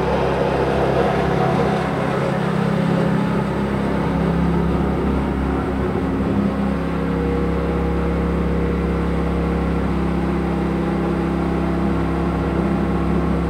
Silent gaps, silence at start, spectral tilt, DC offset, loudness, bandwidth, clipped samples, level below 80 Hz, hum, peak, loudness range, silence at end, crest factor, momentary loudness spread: none; 0 s; -8 dB/octave; under 0.1%; -20 LUFS; 10.5 kHz; under 0.1%; -28 dBFS; none; -6 dBFS; 2 LU; 0 s; 14 dB; 3 LU